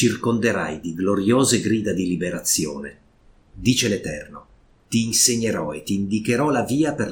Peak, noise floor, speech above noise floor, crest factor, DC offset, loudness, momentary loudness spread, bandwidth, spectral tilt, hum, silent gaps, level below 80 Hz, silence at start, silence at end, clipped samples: -2 dBFS; -54 dBFS; 33 dB; 20 dB; under 0.1%; -21 LUFS; 11 LU; 18 kHz; -4 dB/octave; none; none; -50 dBFS; 0 s; 0 s; under 0.1%